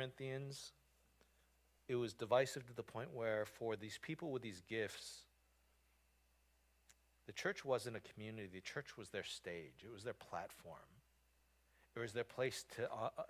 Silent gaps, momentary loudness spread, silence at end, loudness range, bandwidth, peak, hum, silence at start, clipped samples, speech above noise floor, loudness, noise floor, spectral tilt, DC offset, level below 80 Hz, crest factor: none; 12 LU; 0 s; 8 LU; 16 kHz; -22 dBFS; none; 0 s; under 0.1%; 31 dB; -46 LUFS; -77 dBFS; -4.5 dB/octave; under 0.1%; -76 dBFS; 24 dB